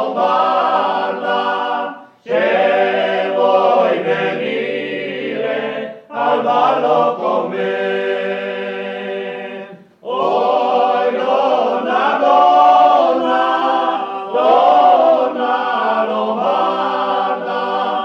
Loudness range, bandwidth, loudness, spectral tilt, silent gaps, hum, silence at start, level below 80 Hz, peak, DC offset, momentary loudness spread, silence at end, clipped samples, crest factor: 6 LU; 6.8 kHz; -15 LUFS; -5.5 dB/octave; none; none; 0 s; -76 dBFS; -2 dBFS; under 0.1%; 12 LU; 0 s; under 0.1%; 14 dB